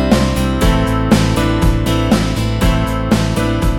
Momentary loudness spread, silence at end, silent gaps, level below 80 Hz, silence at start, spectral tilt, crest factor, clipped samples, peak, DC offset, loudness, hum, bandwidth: 3 LU; 0 s; none; -20 dBFS; 0 s; -6 dB/octave; 14 dB; under 0.1%; 0 dBFS; under 0.1%; -15 LUFS; none; 17.5 kHz